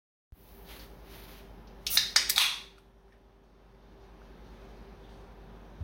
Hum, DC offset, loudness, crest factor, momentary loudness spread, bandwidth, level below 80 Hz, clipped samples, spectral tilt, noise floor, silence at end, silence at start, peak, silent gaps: none; under 0.1%; -26 LUFS; 30 dB; 28 LU; 16.5 kHz; -54 dBFS; under 0.1%; 0.5 dB/octave; -59 dBFS; 0 s; 0.5 s; -6 dBFS; none